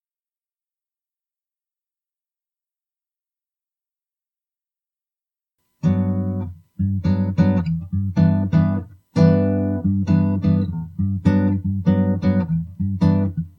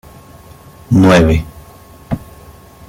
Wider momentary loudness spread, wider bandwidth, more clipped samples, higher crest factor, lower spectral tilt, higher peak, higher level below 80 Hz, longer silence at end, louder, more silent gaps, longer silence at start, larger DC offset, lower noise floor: second, 8 LU vs 16 LU; second, 6.2 kHz vs 16.5 kHz; neither; about the same, 18 dB vs 14 dB; first, -10 dB/octave vs -7 dB/octave; second, -4 dBFS vs 0 dBFS; second, -46 dBFS vs -30 dBFS; second, 0.1 s vs 0.7 s; second, -20 LUFS vs -12 LUFS; neither; first, 5.85 s vs 0.9 s; neither; first, under -90 dBFS vs -39 dBFS